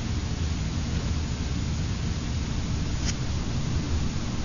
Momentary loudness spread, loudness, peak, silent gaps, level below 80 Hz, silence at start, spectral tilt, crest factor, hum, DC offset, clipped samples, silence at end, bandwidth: 1 LU; -29 LUFS; -16 dBFS; none; -32 dBFS; 0 s; -5 dB/octave; 12 dB; none; under 0.1%; under 0.1%; 0 s; 7.4 kHz